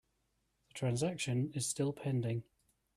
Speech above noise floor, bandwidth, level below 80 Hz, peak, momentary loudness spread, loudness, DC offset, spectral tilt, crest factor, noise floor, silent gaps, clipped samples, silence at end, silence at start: 44 dB; 14 kHz; -70 dBFS; -22 dBFS; 5 LU; -37 LUFS; under 0.1%; -5 dB/octave; 16 dB; -80 dBFS; none; under 0.1%; 0.55 s; 0.75 s